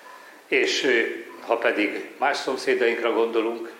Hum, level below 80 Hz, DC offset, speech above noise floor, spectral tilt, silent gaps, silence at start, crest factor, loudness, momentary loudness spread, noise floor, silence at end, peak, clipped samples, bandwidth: none; -86 dBFS; under 0.1%; 22 dB; -2 dB/octave; none; 0.05 s; 16 dB; -23 LUFS; 6 LU; -46 dBFS; 0 s; -8 dBFS; under 0.1%; 16 kHz